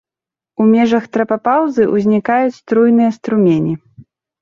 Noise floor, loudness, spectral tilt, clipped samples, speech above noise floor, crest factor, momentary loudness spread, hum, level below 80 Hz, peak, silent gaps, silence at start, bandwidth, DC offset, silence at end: -88 dBFS; -14 LUFS; -8 dB/octave; under 0.1%; 75 dB; 12 dB; 6 LU; none; -56 dBFS; -2 dBFS; none; 0.6 s; 7 kHz; under 0.1%; 0.4 s